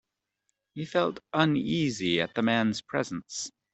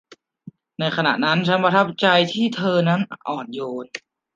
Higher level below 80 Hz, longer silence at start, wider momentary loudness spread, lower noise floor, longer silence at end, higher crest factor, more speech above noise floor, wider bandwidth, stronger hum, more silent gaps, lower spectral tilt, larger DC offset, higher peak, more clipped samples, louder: about the same, -66 dBFS vs -68 dBFS; first, 0.75 s vs 0.1 s; second, 11 LU vs 14 LU; first, -80 dBFS vs -45 dBFS; about the same, 0.25 s vs 0.35 s; about the same, 22 dB vs 18 dB; first, 53 dB vs 25 dB; first, 8.4 kHz vs 7.6 kHz; neither; neither; about the same, -5 dB/octave vs -6 dB/octave; neither; second, -8 dBFS vs -2 dBFS; neither; second, -28 LUFS vs -20 LUFS